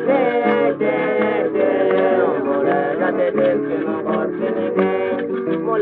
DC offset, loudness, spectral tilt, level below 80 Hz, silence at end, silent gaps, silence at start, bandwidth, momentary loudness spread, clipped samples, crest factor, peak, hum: under 0.1%; -18 LUFS; -5 dB/octave; -62 dBFS; 0 s; none; 0 s; 4.5 kHz; 5 LU; under 0.1%; 14 dB; -4 dBFS; none